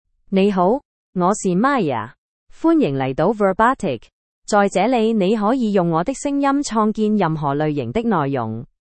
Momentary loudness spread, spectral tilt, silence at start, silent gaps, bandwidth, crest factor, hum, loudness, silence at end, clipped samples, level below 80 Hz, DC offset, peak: 8 LU; -6 dB/octave; 0.3 s; 0.85-1.13 s, 2.18-2.47 s, 4.13-4.42 s; 8.8 kHz; 16 dB; none; -19 LUFS; 0.2 s; under 0.1%; -50 dBFS; under 0.1%; -2 dBFS